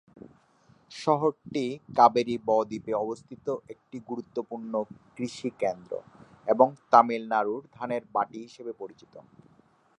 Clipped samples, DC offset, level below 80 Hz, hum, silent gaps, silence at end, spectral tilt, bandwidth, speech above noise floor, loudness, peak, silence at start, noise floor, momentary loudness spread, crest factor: under 0.1%; under 0.1%; -72 dBFS; none; none; 0.8 s; -6 dB/octave; 10.5 kHz; 34 dB; -27 LUFS; -4 dBFS; 0.9 s; -62 dBFS; 19 LU; 26 dB